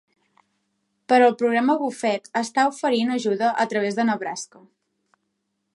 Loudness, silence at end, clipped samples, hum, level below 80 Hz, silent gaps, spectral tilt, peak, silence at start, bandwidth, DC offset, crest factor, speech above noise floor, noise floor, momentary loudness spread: -22 LUFS; 1.3 s; under 0.1%; none; -78 dBFS; none; -4 dB/octave; -6 dBFS; 1.1 s; 11.5 kHz; under 0.1%; 18 dB; 54 dB; -76 dBFS; 9 LU